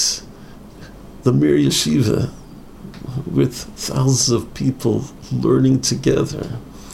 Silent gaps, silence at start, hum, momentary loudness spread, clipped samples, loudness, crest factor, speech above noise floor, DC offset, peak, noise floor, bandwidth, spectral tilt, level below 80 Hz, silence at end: none; 0 s; none; 19 LU; under 0.1%; -18 LUFS; 16 dB; 21 dB; under 0.1%; -2 dBFS; -38 dBFS; 15.5 kHz; -5 dB/octave; -42 dBFS; 0 s